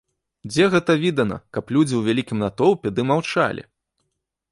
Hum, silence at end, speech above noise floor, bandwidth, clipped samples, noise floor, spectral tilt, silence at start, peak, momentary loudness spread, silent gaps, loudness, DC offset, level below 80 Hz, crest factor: none; 0.9 s; 56 dB; 11.5 kHz; under 0.1%; -76 dBFS; -6 dB/octave; 0.45 s; -4 dBFS; 8 LU; none; -20 LUFS; under 0.1%; -54 dBFS; 18 dB